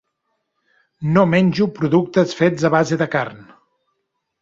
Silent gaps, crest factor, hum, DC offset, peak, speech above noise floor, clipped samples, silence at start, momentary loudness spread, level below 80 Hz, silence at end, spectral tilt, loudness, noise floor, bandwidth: none; 18 dB; none; under 0.1%; -2 dBFS; 57 dB; under 0.1%; 1 s; 7 LU; -56 dBFS; 1 s; -7 dB/octave; -17 LUFS; -74 dBFS; 7.8 kHz